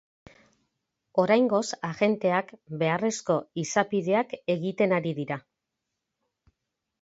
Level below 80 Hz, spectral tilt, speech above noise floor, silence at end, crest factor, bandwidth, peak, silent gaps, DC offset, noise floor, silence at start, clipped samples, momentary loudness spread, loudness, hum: -72 dBFS; -5.5 dB/octave; 58 dB; 1.6 s; 20 dB; 8 kHz; -8 dBFS; none; under 0.1%; -84 dBFS; 1.15 s; under 0.1%; 9 LU; -27 LUFS; none